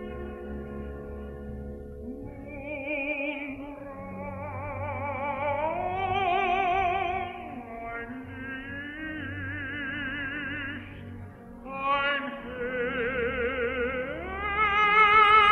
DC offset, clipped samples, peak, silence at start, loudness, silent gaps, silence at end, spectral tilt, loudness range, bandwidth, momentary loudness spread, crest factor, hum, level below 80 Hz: under 0.1%; under 0.1%; -10 dBFS; 0 s; -28 LUFS; none; 0 s; -6 dB/octave; 8 LU; 12 kHz; 15 LU; 20 dB; none; -48 dBFS